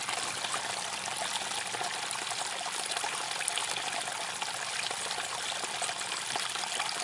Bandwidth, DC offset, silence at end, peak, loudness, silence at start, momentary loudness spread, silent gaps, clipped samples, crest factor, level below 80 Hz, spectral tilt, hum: 11.5 kHz; under 0.1%; 0 s; -10 dBFS; -32 LUFS; 0 s; 2 LU; none; under 0.1%; 24 dB; -82 dBFS; 0.5 dB/octave; none